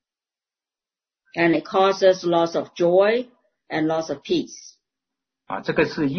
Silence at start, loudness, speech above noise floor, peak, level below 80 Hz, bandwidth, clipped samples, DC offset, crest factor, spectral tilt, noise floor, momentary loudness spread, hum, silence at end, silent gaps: 1.35 s; -21 LUFS; over 70 dB; -4 dBFS; -60 dBFS; 6.6 kHz; under 0.1%; under 0.1%; 18 dB; -5.5 dB/octave; under -90 dBFS; 16 LU; none; 0 s; none